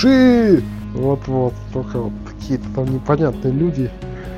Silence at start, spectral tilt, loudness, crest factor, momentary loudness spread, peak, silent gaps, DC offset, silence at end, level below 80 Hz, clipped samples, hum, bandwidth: 0 s; -8 dB/octave; -18 LUFS; 16 dB; 15 LU; -2 dBFS; none; under 0.1%; 0 s; -36 dBFS; under 0.1%; none; 7.2 kHz